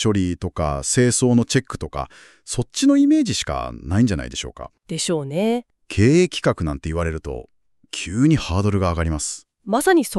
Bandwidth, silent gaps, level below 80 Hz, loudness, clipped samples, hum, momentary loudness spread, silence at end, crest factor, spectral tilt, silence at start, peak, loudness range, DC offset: 13.5 kHz; none; -38 dBFS; -20 LUFS; under 0.1%; none; 14 LU; 0 s; 16 dB; -5 dB/octave; 0 s; -4 dBFS; 2 LU; under 0.1%